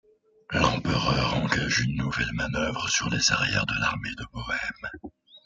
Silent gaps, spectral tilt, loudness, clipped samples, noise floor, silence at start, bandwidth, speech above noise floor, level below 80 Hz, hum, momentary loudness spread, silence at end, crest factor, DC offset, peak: none; -3.5 dB/octave; -26 LUFS; under 0.1%; -47 dBFS; 0.5 s; 9.4 kHz; 20 dB; -44 dBFS; none; 12 LU; 0.05 s; 20 dB; under 0.1%; -6 dBFS